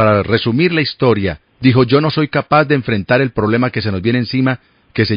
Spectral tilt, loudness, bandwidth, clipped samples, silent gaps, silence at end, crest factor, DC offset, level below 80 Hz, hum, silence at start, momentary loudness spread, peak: -9.5 dB/octave; -14 LUFS; 5.2 kHz; under 0.1%; none; 0 s; 14 dB; under 0.1%; -44 dBFS; none; 0 s; 5 LU; 0 dBFS